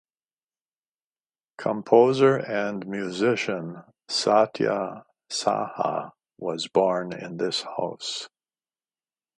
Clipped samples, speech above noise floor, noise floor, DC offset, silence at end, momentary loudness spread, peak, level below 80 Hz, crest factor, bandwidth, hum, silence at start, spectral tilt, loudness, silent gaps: under 0.1%; over 66 dB; under -90 dBFS; under 0.1%; 1.1 s; 15 LU; -4 dBFS; -74 dBFS; 22 dB; 11.5 kHz; none; 1.6 s; -4.5 dB/octave; -25 LUFS; none